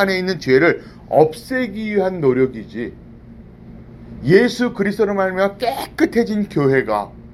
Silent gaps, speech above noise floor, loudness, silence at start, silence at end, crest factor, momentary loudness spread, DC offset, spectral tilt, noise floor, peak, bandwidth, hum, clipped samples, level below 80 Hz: none; 22 dB; -18 LUFS; 0 s; 0 s; 18 dB; 12 LU; under 0.1%; -6.5 dB/octave; -39 dBFS; 0 dBFS; 13.5 kHz; none; under 0.1%; -46 dBFS